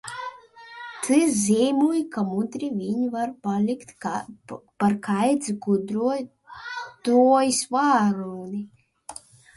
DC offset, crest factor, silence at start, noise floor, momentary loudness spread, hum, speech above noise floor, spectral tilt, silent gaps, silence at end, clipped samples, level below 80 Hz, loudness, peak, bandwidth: under 0.1%; 16 dB; 0.05 s; -45 dBFS; 20 LU; none; 22 dB; -5 dB/octave; none; 0.45 s; under 0.1%; -66 dBFS; -23 LUFS; -8 dBFS; 11.5 kHz